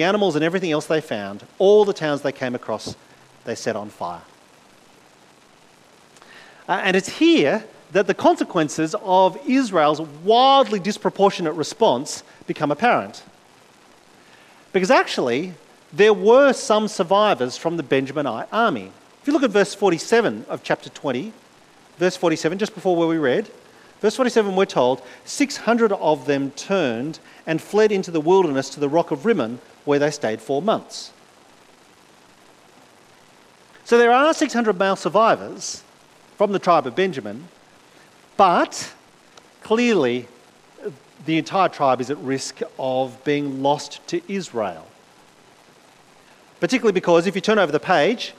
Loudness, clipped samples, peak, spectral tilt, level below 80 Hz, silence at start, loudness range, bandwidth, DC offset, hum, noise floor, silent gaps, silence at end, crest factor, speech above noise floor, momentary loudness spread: -20 LUFS; under 0.1%; -2 dBFS; -4.5 dB/octave; -68 dBFS; 0 s; 8 LU; 13.5 kHz; under 0.1%; none; -52 dBFS; none; 0.05 s; 18 dB; 32 dB; 14 LU